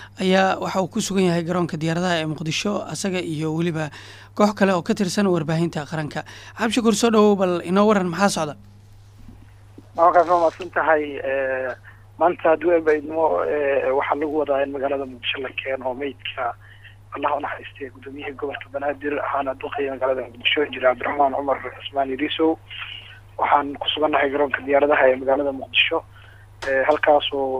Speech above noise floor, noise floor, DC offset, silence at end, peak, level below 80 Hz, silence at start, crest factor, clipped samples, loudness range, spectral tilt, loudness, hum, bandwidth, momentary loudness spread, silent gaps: 25 dB; -46 dBFS; under 0.1%; 0 s; -4 dBFS; -54 dBFS; 0 s; 18 dB; under 0.1%; 7 LU; -5 dB/octave; -21 LUFS; none; 15.5 kHz; 12 LU; none